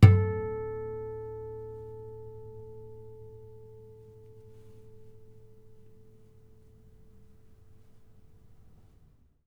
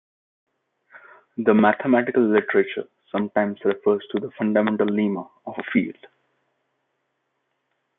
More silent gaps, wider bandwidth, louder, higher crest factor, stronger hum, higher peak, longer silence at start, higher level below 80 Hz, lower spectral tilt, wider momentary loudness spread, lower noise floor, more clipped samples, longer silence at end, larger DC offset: neither; first, 5.6 kHz vs 3.9 kHz; second, -32 LUFS vs -22 LUFS; first, 28 dB vs 20 dB; neither; about the same, -2 dBFS vs -4 dBFS; second, 0 s vs 0.95 s; first, -52 dBFS vs -70 dBFS; second, -9 dB/octave vs -11 dB/octave; first, 22 LU vs 14 LU; second, -60 dBFS vs -75 dBFS; neither; first, 4.35 s vs 2.05 s; neither